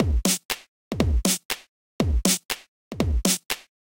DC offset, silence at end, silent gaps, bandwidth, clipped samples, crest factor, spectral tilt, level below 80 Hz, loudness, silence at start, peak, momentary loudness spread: under 0.1%; 0.4 s; 0.45-0.49 s, 0.68-0.91 s, 1.45-1.49 s, 1.69-1.99 s, 2.45-2.49 s, 2.68-2.91 s; 17 kHz; under 0.1%; 20 dB; -3.5 dB/octave; -30 dBFS; -25 LUFS; 0 s; -4 dBFS; 10 LU